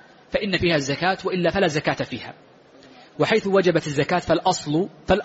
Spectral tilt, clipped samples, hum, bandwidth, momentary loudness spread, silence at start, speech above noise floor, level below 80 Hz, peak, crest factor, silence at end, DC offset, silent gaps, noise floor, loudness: -4 dB/octave; under 0.1%; none; 8 kHz; 9 LU; 0.3 s; 27 dB; -46 dBFS; -6 dBFS; 16 dB; 0 s; under 0.1%; none; -49 dBFS; -22 LUFS